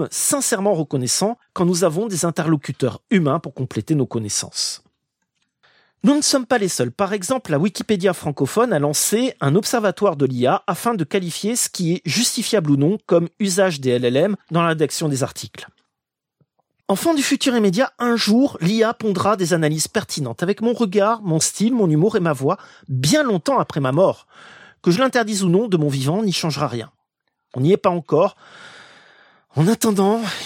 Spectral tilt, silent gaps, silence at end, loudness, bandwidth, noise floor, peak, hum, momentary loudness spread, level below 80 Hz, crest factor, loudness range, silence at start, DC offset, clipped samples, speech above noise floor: -4.5 dB/octave; none; 0 s; -19 LUFS; 16.5 kHz; -82 dBFS; -4 dBFS; none; 6 LU; -62 dBFS; 16 dB; 3 LU; 0 s; under 0.1%; under 0.1%; 64 dB